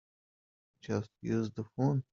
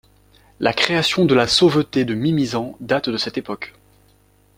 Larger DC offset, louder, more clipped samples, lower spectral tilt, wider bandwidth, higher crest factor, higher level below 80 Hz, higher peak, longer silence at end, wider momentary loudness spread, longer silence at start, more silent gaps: neither; second, -35 LUFS vs -18 LUFS; neither; first, -8.5 dB/octave vs -5 dB/octave; second, 7 kHz vs 16 kHz; about the same, 18 dB vs 20 dB; second, -68 dBFS vs -52 dBFS; second, -18 dBFS vs 0 dBFS; second, 0.1 s vs 0.9 s; second, 6 LU vs 13 LU; first, 0.85 s vs 0.6 s; neither